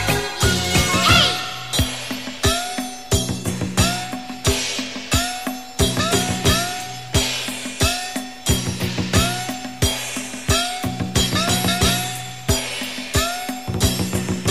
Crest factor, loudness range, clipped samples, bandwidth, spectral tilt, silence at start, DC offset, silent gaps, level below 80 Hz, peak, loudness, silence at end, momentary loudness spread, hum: 18 dB; 3 LU; under 0.1%; 15.5 kHz; -3.5 dB/octave; 0 s; 0.8%; none; -32 dBFS; -2 dBFS; -20 LUFS; 0 s; 9 LU; none